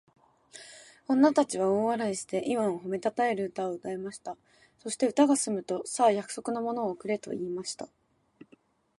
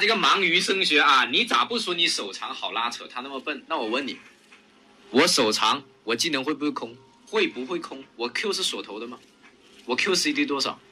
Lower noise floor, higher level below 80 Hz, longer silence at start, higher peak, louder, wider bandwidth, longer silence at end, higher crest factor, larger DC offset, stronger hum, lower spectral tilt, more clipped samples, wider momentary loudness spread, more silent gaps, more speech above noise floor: first, -63 dBFS vs -55 dBFS; about the same, -74 dBFS vs -74 dBFS; first, 0.55 s vs 0 s; about the same, -10 dBFS vs -8 dBFS; second, -29 LUFS vs -23 LUFS; second, 11.5 kHz vs 15.5 kHz; first, 1.15 s vs 0.15 s; about the same, 20 dB vs 18 dB; neither; neither; first, -4.5 dB/octave vs -2 dB/octave; neither; first, 19 LU vs 15 LU; neither; first, 35 dB vs 30 dB